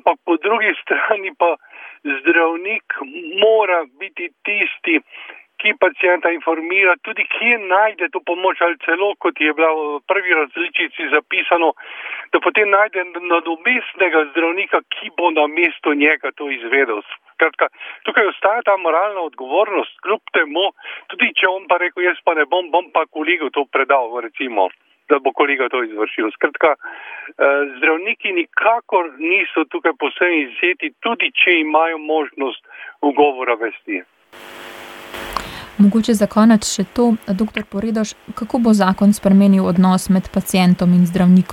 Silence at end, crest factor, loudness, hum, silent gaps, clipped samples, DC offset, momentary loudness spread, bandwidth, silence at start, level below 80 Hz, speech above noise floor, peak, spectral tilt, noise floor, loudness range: 0 s; 16 dB; -17 LUFS; none; none; under 0.1%; under 0.1%; 12 LU; 15 kHz; 0.05 s; -52 dBFS; 21 dB; -2 dBFS; -5.5 dB/octave; -38 dBFS; 2 LU